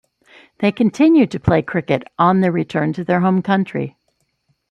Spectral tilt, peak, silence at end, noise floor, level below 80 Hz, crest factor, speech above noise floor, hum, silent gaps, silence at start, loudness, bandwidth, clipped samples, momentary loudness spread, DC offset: -8 dB/octave; -2 dBFS; 0.8 s; -67 dBFS; -48 dBFS; 16 dB; 51 dB; none; none; 0.6 s; -17 LUFS; 8.4 kHz; under 0.1%; 8 LU; under 0.1%